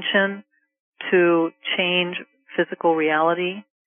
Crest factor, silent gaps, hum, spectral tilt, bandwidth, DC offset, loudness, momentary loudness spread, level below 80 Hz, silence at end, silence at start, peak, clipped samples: 18 dB; 0.80-0.92 s; none; -1 dB/octave; 3.6 kHz; under 0.1%; -21 LUFS; 11 LU; -76 dBFS; 0.25 s; 0 s; -6 dBFS; under 0.1%